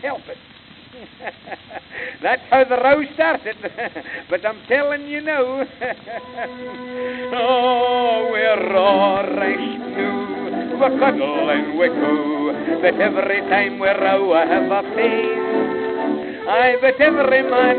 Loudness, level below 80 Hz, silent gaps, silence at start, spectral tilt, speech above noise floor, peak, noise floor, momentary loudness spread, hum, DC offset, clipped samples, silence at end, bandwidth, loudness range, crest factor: -18 LUFS; -60 dBFS; none; 0 s; -9 dB/octave; 26 dB; -2 dBFS; -43 dBFS; 15 LU; none; under 0.1%; under 0.1%; 0 s; 4.6 kHz; 4 LU; 18 dB